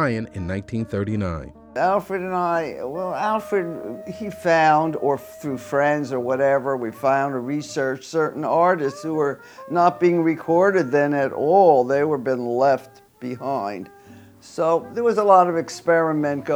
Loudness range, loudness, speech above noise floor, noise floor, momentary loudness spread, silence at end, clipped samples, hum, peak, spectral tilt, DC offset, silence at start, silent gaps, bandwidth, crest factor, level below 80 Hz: 5 LU; -21 LUFS; 25 dB; -46 dBFS; 14 LU; 0 s; under 0.1%; none; -2 dBFS; -6.5 dB/octave; under 0.1%; 0 s; none; over 20 kHz; 20 dB; -54 dBFS